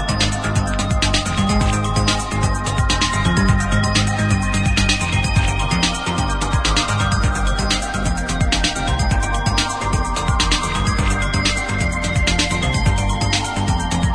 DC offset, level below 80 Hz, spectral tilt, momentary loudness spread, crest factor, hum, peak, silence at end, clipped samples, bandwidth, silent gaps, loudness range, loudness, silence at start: under 0.1%; -24 dBFS; -4 dB/octave; 3 LU; 16 dB; none; -2 dBFS; 0 s; under 0.1%; 11 kHz; none; 2 LU; -18 LUFS; 0 s